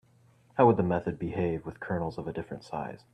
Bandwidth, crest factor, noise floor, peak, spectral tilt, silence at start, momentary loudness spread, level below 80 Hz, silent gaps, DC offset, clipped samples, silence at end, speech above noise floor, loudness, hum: 9 kHz; 22 dB; -62 dBFS; -8 dBFS; -9 dB/octave; 0.55 s; 14 LU; -58 dBFS; none; under 0.1%; under 0.1%; 0.15 s; 33 dB; -30 LUFS; none